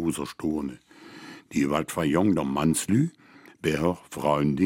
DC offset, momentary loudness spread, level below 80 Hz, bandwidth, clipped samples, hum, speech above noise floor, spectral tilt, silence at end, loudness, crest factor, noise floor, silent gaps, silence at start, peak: under 0.1%; 14 LU; -52 dBFS; 16.5 kHz; under 0.1%; none; 20 dB; -5.5 dB/octave; 0 s; -26 LUFS; 18 dB; -45 dBFS; none; 0 s; -8 dBFS